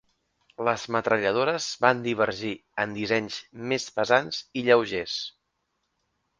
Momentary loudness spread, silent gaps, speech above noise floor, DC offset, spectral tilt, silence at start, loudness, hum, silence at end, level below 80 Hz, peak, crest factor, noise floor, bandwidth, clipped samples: 10 LU; none; 51 dB; under 0.1%; -4 dB/octave; 0.6 s; -26 LUFS; none; 1.1 s; -64 dBFS; -2 dBFS; 24 dB; -77 dBFS; 9.8 kHz; under 0.1%